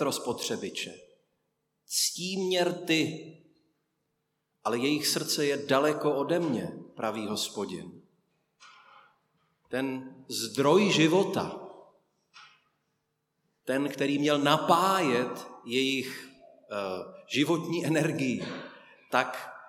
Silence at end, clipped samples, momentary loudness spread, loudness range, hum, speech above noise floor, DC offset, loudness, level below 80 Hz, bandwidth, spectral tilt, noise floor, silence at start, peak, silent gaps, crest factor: 0 s; under 0.1%; 16 LU; 7 LU; none; 51 dB; under 0.1%; -28 LUFS; -78 dBFS; 17 kHz; -4 dB/octave; -79 dBFS; 0 s; -8 dBFS; none; 22 dB